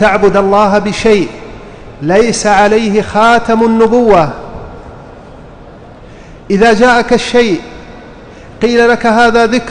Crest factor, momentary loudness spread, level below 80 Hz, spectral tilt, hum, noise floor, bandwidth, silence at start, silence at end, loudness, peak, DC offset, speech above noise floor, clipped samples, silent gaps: 10 dB; 21 LU; -34 dBFS; -5 dB/octave; none; -33 dBFS; 10.5 kHz; 0 s; 0 s; -9 LUFS; 0 dBFS; under 0.1%; 24 dB; under 0.1%; none